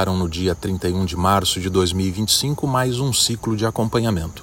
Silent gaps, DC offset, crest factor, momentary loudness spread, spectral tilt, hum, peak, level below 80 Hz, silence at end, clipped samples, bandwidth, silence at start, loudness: none; under 0.1%; 18 dB; 5 LU; -4.5 dB/octave; none; -2 dBFS; -42 dBFS; 0 s; under 0.1%; 16.5 kHz; 0 s; -20 LUFS